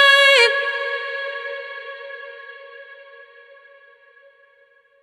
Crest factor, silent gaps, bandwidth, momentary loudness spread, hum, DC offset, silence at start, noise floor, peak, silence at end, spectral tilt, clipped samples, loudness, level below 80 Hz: 20 dB; none; 16 kHz; 28 LU; none; under 0.1%; 0 s; -56 dBFS; -2 dBFS; 2.1 s; 4 dB/octave; under 0.1%; -16 LUFS; -82 dBFS